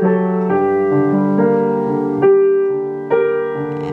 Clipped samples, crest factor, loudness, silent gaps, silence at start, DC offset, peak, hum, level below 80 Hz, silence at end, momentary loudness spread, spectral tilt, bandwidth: under 0.1%; 12 dB; -15 LUFS; none; 0 s; under 0.1%; -2 dBFS; none; -60 dBFS; 0 s; 7 LU; -10.5 dB/octave; 3.5 kHz